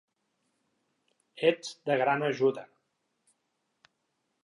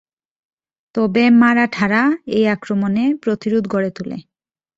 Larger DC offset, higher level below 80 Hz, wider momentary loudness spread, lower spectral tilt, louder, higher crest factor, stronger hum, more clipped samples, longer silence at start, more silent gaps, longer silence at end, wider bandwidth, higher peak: neither; second, -88 dBFS vs -58 dBFS; second, 7 LU vs 13 LU; second, -5 dB/octave vs -7 dB/octave; second, -29 LUFS vs -16 LUFS; first, 22 dB vs 16 dB; neither; neither; first, 1.35 s vs 0.95 s; neither; first, 1.8 s vs 0.55 s; first, 11 kHz vs 7.6 kHz; second, -10 dBFS vs -2 dBFS